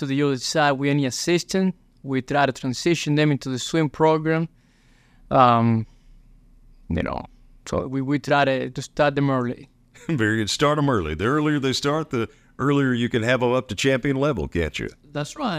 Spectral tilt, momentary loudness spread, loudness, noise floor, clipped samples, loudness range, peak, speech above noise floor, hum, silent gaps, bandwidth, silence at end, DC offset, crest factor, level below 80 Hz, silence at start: -5.5 dB/octave; 10 LU; -22 LUFS; -56 dBFS; under 0.1%; 2 LU; -2 dBFS; 35 dB; none; none; 15.5 kHz; 0 s; under 0.1%; 20 dB; -46 dBFS; 0 s